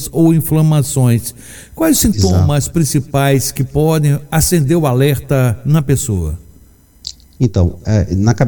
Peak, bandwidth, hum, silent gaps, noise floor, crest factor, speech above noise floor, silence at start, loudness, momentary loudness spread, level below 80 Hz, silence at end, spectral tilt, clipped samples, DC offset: 0 dBFS; 17.5 kHz; none; none; -44 dBFS; 14 dB; 32 dB; 0 s; -13 LUFS; 13 LU; -32 dBFS; 0 s; -6 dB/octave; under 0.1%; under 0.1%